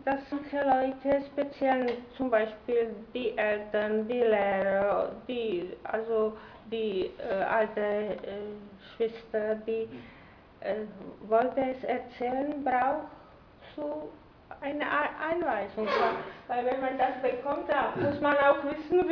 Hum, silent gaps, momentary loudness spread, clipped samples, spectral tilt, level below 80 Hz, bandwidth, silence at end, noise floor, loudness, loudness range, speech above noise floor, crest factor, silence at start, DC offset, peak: none; none; 12 LU; under 0.1%; -7.5 dB/octave; -62 dBFS; 5.4 kHz; 0 s; -53 dBFS; -30 LUFS; 4 LU; 24 dB; 20 dB; 0 s; under 0.1%; -10 dBFS